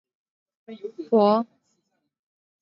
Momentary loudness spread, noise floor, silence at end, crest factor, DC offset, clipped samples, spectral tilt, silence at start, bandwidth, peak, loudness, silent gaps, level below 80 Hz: 19 LU; -74 dBFS; 1.15 s; 20 dB; under 0.1%; under 0.1%; -9 dB/octave; 0.7 s; 5.8 kHz; -6 dBFS; -21 LUFS; none; -82 dBFS